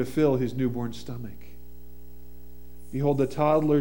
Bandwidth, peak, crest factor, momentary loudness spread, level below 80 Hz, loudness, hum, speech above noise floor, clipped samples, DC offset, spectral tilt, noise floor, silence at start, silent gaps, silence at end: 18 kHz; -10 dBFS; 18 dB; 16 LU; -50 dBFS; -26 LUFS; none; 23 dB; under 0.1%; 1%; -8 dB/octave; -48 dBFS; 0 s; none; 0 s